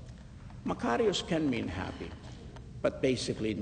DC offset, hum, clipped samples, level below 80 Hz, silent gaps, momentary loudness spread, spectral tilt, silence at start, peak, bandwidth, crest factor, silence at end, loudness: under 0.1%; none; under 0.1%; -52 dBFS; none; 18 LU; -5 dB/octave; 0 s; -16 dBFS; 9.6 kHz; 18 dB; 0 s; -32 LUFS